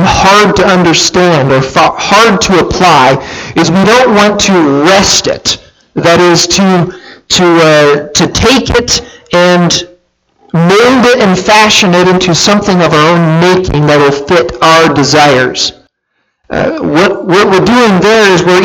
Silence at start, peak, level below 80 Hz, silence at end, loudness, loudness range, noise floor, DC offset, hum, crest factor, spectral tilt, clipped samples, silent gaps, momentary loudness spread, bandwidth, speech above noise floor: 0 s; 0 dBFS; -32 dBFS; 0 s; -6 LUFS; 2 LU; -62 dBFS; under 0.1%; none; 6 dB; -4 dB/octave; 0.7%; none; 7 LU; 18.5 kHz; 56 dB